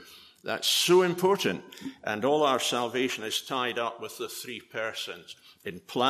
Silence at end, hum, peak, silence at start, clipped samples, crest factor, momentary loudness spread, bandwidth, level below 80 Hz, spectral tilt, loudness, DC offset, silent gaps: 0 s; none; -10 dBFS; 0 s; under 0.1%; 18 dB; 19 LU; 15 kHz; -76 dBFS; -3 dB/octave; -28 LUFS; under 0.1%; none